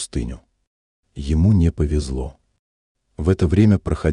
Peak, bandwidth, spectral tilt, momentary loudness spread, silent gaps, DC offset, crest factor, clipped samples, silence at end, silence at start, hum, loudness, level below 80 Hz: -4 dBFS; 11 kHz; -7.5 dB/octave; 16 LU; 0.67-1.03 s, 2.59-2.95 s; under 0.1%; 16 dB; under 0.1%; 0 s; 0 s; none; -19 LUFS; -30 dBFS